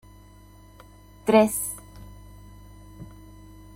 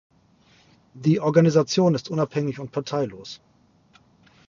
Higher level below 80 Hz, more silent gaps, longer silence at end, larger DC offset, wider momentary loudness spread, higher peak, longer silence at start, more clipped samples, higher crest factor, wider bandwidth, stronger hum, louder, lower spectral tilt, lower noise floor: first, -50 dBFS vs -64 dBFS; neither; second, 0.65 s vs 1.15 s; neither; first, 29 LU vs 16 LU; about the same, -6 dBFS vs -4 dBFS; first, 1.25 s vs 0.95 s; neither; about the same, 24 dB vs 22 dB; first, 16.5 kHz vs 7.4 kHz; first, 50 Hz at -50 dBFS vs none; about the same, -22 LUFS vs -22 LUFS; second, -4.5 dB/octave vs -6.5 dB/octave; second, -50 dBFS vs -58 dBFS